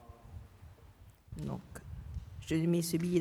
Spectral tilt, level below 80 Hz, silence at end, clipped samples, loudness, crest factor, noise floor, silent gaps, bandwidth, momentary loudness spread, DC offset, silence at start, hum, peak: -6 dB/octave; -54 dBFS; 0 s; under 0.1%; -36 LUFS; 18 dB; -58 dBFS; none; 17.5 kHz; 25 LU; under 0.1%; 0 s; none; -18 dBFS